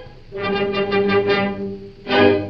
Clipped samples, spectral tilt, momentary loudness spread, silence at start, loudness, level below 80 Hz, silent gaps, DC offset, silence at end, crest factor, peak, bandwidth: under 0.1%; -7.5 dB/octave; 14 LU; 0 s; -19 LUFS; -44 dBFS; none; under 0.1%; 0 s; 18 dB; 0 dBFS; 6 kHz